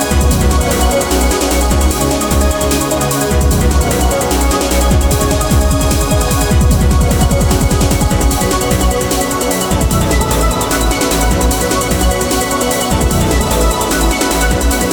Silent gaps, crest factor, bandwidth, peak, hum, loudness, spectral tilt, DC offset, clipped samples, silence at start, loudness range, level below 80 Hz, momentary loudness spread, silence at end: none; 12 dB; 19.5 kHz; 0 dBFS; none; -13 LUFS; -4.5 dB/octave; under 0.1%; under 0.1%; 0 s; 1 LU; -16 dBFS; 2 LU; 0 s